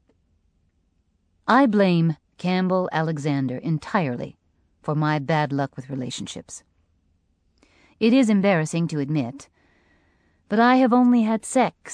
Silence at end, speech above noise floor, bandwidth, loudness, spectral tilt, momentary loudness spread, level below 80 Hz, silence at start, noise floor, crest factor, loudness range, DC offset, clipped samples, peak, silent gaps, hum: 0 s; 46 dB; 10.5 kHz; -22 LUFS; -6.5 dB/octave; 15 LU; -64 dBFS; 1.5 s; -67 dBFS; 20 dB; 6 LU; under 0.1%; under 0.1%; -4 dBFS; none; none